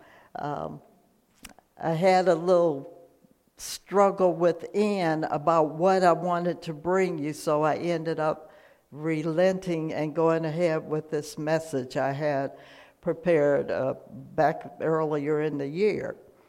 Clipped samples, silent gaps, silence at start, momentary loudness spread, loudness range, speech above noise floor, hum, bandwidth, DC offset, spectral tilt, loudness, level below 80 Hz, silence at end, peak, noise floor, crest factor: under 0.1%; none; 0.4 s; 12 LU; 3 LU; 38 dB; none; 16 kHz; under 0.1%; -6.5 dB/octave; -26 LUFS; -66 dBFS; 0.35 s; -8 dBFS; -63 dBFS; 20 dB